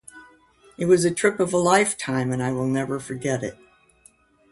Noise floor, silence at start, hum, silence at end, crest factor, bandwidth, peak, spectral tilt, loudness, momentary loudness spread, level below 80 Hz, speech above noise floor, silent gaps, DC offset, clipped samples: -57 dBFS; 0.15 s; none; 1 s; 20 dB; 11.5 kHz; -4 dBFS; -5 dB/octave; -22 LUFS; 10 LU; -58 dBFS; 35 dB; none; under 0.1%; under 0.1%